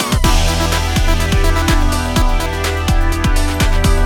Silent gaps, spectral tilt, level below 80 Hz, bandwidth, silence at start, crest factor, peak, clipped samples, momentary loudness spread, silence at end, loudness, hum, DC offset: none; -4.5 dB/octave; -14 dBFS; 18.5 kHz; 0 s; 12 dB; 0 dBFS; under 0.1%; 3 LU; 0 s; -16 LUFS; none; under 0.1%